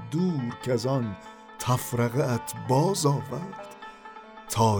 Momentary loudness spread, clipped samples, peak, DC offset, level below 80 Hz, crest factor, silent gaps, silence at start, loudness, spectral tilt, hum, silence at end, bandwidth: 19 LU; under 0.1%; -10 dBFS; under 0.1%; -58 dBFS; 18 dB; none; 0 s; -27 LUFS; -6 dB/octave; none; 0 s; over 20 kHz